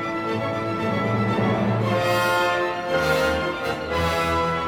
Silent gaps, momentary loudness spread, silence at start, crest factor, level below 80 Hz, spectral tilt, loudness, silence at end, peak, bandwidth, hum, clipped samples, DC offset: none; 5 LU; 0 s; 14 dB; -44 dBFS; -5.5 dB/octave; -22 LUFS; 0 s; -8 dBFS; 19 kHz; none; under 0.1%; under 0.1%